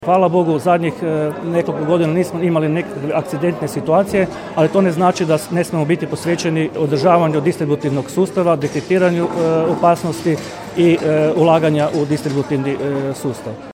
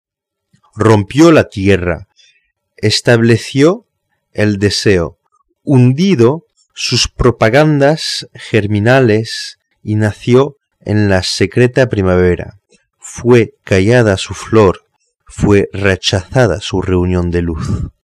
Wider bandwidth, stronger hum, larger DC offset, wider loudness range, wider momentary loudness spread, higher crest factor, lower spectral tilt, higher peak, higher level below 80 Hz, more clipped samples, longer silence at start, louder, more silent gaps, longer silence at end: first, 16.5 kHz vs 13 kHz; neither; neither; about the same, 2 LU vs 2 LU; second, 7 LU vs 11 LU; about the same, 16 dB vs 12 dB; about the same, -7 dB/octave vs -6 dB/octave; about the same, 0 dBFS vs 0 dBFS; second, -54 dBFS vs -34 dBFS; neither; second, 0 s vs 0.75 s; second, -17 LUFS vs -12 LUFS; neither; second, 0 s vs 0.15 s